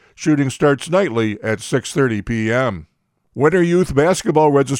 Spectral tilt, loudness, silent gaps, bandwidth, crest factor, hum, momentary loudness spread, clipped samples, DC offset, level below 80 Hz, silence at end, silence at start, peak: -6 dB/octave; -17 LUFS; none; 16.5 kHz; 16 dB; none; 7 LU; under 0.1%; under 0.1%; -42 dBFS; 0 s; 0.2 s; -2 dBFS